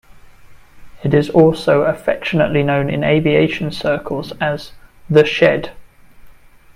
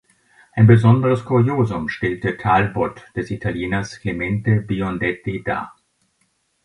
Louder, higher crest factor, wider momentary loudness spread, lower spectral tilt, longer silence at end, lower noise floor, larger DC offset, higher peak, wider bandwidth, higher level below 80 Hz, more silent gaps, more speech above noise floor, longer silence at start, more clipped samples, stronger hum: first, -16 LUFS vs -19 LUFS; about the same, 16 dB vs 18 dB; second, 9 LU vs 13 LU; about the same, -7 dB/octave vs -8 dB/octave; second, 0.45 s vs 0.95 s; second, -41 dBFS vs -66 dBFS; neither; about the same, 0 dBFS vs 0 dBFS; first, 13.5 kHz vs 10 kHz; about the same, -44 dBFS vs -44 dBFS; neither; second, 27 dB vs 48 dB; second, 0.15 s vs 0.55 s; neither; neither